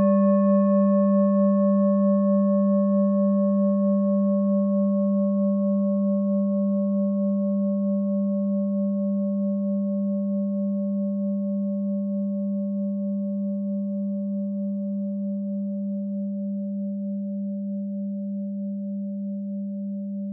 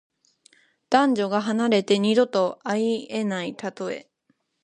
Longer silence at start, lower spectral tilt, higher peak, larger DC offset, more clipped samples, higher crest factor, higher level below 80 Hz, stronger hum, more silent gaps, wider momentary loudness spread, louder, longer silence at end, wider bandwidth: second, 0 s vs 0.9 s; first, -11 dB/octave vs -5.5 dB/octave; second, -12 dBFS vs -4 dBFS; neither; neither; second, 12 dB vs 22 dB; second, under -90 dBFS vs -74 dBFS; neither; neither; about the same, 10 LU vs 12 LU; about the same, -24 LUFS vs -23 LUFS; second, 0 s vs 0.6 s; second, 1.9 kHz vs 10.5 kHz